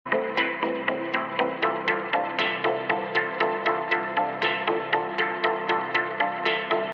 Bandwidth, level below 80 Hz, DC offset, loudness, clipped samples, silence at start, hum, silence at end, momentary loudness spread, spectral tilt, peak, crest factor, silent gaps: 7.2 kHz; -70 dBFS; under 0.1%; -25 LUFS; under 0.1%; 0.05 s; none; 0 s; 2 LU; -5.5 dB/octave; -8 dBFS; 18 dB; none